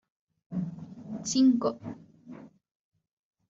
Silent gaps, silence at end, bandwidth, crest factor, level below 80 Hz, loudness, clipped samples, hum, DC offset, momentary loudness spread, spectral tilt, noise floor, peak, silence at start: none; 1 s; 7.8 kHz; 18 dB; -72 dBFS; -28 LUFS; under 0.1%; none; under 0.1%; 25 LU; -7 dB/octave; -49 dBFS; -14 dBFS; 0.5 s